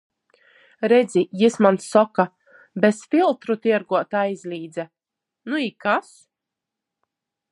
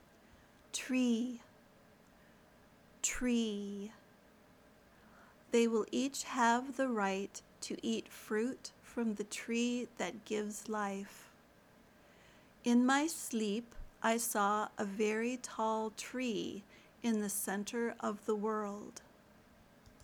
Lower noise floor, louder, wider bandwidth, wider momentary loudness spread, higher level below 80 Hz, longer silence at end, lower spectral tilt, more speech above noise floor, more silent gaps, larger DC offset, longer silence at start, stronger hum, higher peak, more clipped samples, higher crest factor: first, -85 dBFS vs -64 dBFS; first, -21 LUFS vs -36 LUFS; second, 11.5 kHz vs over 20 kHz; about the same, 14 LU vs 13 LU; second, -76 dBFS vs -66 dBFS; first, 1.5 s vs 0 s; first, -5.5 dB/octave vs -3.5 dB/octave; first, 65 dB vs 28 dB; neither; neither; about the same, 0.8 s vs 0.75 s; neither; first, -2 dBFS vs -18 dBFS; neither; about the same, 20 dB vs 20 dB